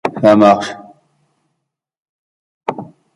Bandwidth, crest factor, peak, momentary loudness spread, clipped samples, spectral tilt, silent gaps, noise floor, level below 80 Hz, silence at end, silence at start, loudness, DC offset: 11 kHz; 16 dB; 0 dBFS; 22 LU; under 0.1%; -6.5 dB/octave; 2.00-2.61 s; -75 dBFS; -58 dBFS; 0.3 s; 0.05 s; -12 LUFS; under 0.1%